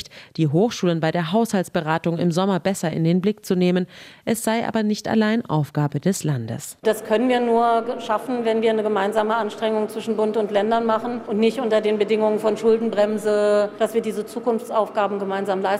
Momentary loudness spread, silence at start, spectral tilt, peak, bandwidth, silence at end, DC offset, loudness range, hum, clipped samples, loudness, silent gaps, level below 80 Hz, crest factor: 5 LU; 0 s; -6 dB/octave; -6 dBFS; 16 kHz; 0 s; under 0.1%; 2 LU; none; under 0.1%; -21 LUFS; none; -64 dBFS; 14 dB